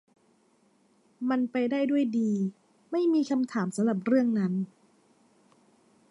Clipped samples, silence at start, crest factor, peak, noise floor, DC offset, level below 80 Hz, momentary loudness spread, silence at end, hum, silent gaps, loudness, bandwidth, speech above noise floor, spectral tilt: under 0.1%; 1.2 s; 16 dB; -14 dBFS; -66 dBFS; under 0.1%; -80 dBFS; 9 LU; 1.45 s; none; none; -28 LUFS; 11.5 kHz; 40 dB; -7 dB/octave